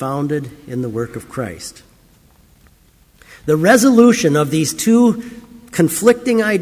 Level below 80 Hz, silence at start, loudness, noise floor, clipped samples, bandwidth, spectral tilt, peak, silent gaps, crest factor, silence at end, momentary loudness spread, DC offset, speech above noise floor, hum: -50 dBFS; 0 s; -15 LUFS; -51 dBFS; under 0.1%; 16 kHz; -5 dB/octave; 0 dBFS; none; 16 dB; 0 s; 17 LU; under 0.1%; 36 dB; none